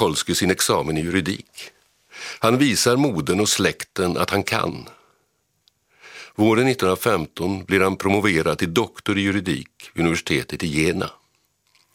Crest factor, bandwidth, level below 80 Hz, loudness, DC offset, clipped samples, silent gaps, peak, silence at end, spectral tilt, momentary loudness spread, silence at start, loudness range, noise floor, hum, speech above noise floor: 20 dB; 16.5 kHz; -50 dBFS; -21 LUFS; under 0.1%; under 0.1%; none; -2 dBFS; 0.85 s; -4 dB/octave; 14 LU; 0 s; 3 LU; -68 dBFS; none; 48 dB